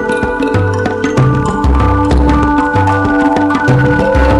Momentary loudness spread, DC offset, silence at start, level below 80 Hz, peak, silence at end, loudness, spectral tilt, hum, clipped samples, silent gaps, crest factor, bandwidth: 3 LU; under 0.1%; 0 s; -18 dBFS; 0 dBFS; 0 s; -11 LUFS; -7.5 dB/octave; none; under 0.1%; none; 10 dB; 11 kHz